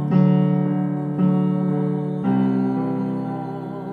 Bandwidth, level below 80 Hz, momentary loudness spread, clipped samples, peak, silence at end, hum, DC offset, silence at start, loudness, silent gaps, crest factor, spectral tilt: 4.3 kHz; -62 dBFS; 10 LU; under 0.1%; -6 dBFS; 0 s; none; under 0.1%; 0 s; -21 LUFS; none; 14 dB; -11 dB/octave